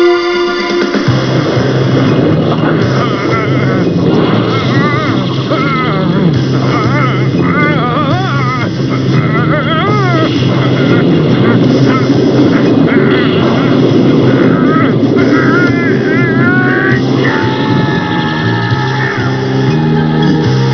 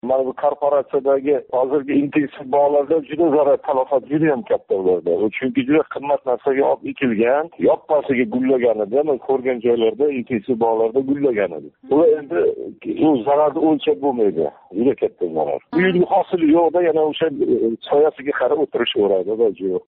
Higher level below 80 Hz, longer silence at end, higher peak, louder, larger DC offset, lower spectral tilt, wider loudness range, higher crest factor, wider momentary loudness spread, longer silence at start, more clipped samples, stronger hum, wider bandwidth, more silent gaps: first, -40 dBFS vs -60 dBFS; about the same, 0 s vs 0.1 s; first, 0 dBFS vs -6 dBFS; first, -10 LUFS vs -18 LUFS; first, 0.4% vs under 0.1%; first, -7.5 dB/octave vs -4.5 dB/octave; about the same, 2 LU vs 1 LU; about the same, 10 dB vs 12 dB; about the same, 4 LU vs 5 LU; about the same, 0 s vs 0.05 s; first, 0.3% vs under 0.1%; neither; first, 5.4 kHz vs 4.1 kHz; neither